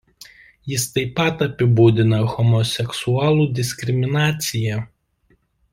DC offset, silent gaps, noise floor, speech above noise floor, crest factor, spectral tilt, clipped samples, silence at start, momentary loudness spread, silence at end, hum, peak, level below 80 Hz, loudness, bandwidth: under 0.1%; none; -62 dBFS; 44 dB; 18 dB; -5.5 dB/octave; under 0.1%; 0.65 s; 10 LU; 0.85 s; none; -2 dBFS; -52 dBFS; -19 LUFS; 16 kHz